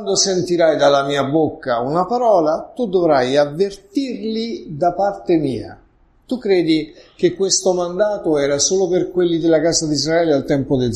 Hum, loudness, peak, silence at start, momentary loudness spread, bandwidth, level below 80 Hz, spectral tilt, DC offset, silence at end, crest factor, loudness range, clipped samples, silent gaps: none; -17 LUFS; -2 dBFS; 0 s; 8 LU; 12 kHz; -48 dBFS; -4 dB/octave; under 0.1%; 0 s; 16 dB; 4 LU; under 0.1%; none